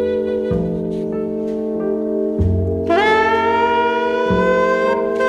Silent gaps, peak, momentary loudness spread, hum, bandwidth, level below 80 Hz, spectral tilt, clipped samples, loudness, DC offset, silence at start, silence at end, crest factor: none; -4 dBFS; 8 LU; none; 10 kHz; -36 dBFS; -7 dB/octave; under 0.1%; -17 LUFS; under 0.1%; 0 s; 0 s; 14 dB